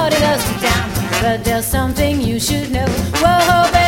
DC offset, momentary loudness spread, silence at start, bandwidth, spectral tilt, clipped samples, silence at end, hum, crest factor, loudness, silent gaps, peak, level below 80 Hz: under 0.1%; 6 LU; 0 s; 17 kHz; -4.5 dB/octave; under 0.1%; 0 s; none; 14 dB; -15 LUFS; none; 0 dBFS; -28 dBFS